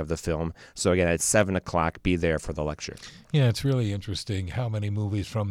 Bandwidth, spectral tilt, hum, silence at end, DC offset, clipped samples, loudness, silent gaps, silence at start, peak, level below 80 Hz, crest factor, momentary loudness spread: 15.5 kHz; -5 dB/octave; none; 0 s; under 0.1%; under 0.1%; -27 LUFS; none; 0 s; -8 dBFS; -44 dBFS; 18 dB; 9 LU